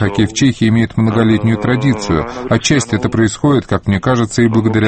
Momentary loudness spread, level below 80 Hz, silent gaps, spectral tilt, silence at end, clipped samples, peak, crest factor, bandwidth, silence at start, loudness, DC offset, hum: 4 LU; -36 dBFS; none; -6 dB/octave; 0 s; under 0.1%; 0 dBFS; 12 dB; 8.8 kHz; 0 s; -14 LUFS; under 0.1%; none